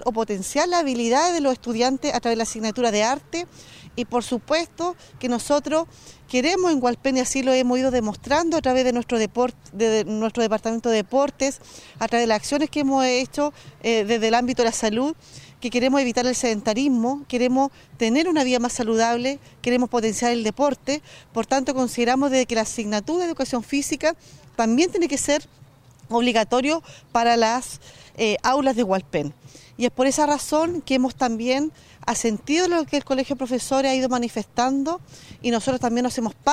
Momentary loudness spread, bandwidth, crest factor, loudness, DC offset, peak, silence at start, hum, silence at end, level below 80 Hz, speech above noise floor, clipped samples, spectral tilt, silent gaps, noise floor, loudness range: 8 LU; 15.5 kHz; 16 dB; -22 LUFS; under 0.1%; -6 dBFS; 0 s; none; 0 s; -52 dBFS; 27 dB; under 0.1%; -3.5 dB/octave; none; -49 dBFS; 2 LU